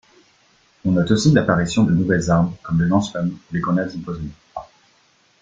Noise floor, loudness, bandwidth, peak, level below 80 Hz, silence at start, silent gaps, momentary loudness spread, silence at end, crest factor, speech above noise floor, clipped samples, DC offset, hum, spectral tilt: -58 dBFS; -19 LUFS; 9 kHz; -2 dBFS; -46 dBFS; 0.85 s; none; 16 LU; 0.75 s; 18 dB; 40 dB; under 0.1%; under 0.1%; none; -6.5 dB/octave